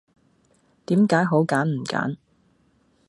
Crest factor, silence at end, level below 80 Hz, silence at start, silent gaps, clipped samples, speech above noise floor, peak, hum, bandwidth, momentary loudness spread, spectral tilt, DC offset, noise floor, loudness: 20 dB; 0.95 s; -68 dBFS; 0.9 s; none; under 0.1%; 42 dB; -4 dBFS; none; 11.5 kHz; 10 LU; -7 dB/octave; under 0.1%; -63 dBFS; -22 LUFS